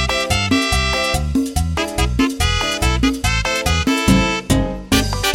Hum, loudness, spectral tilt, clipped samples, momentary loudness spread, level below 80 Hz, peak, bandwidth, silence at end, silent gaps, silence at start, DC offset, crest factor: none; -17 LUFS; -4 dB/octave; under 0.1%; 4 LU; -24 dBFS; -2 dBFS; 16.5 kHz; 0 s; none; 0 s; under 0.1%; 16 dB